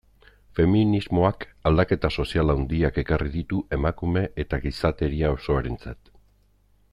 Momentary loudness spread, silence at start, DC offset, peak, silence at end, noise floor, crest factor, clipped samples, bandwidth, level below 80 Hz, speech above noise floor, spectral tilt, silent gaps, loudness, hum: 7 LU; 0.55 s; under 0.1%; -6 dBFS; 1 s; -61 dBFS; 18 dB; under 0.1%; 10.5 kHz; -34 dBFS; 38 dB; -8.5 dB/octave; none; -24 LUFS; 50 Hz at -50 dBFS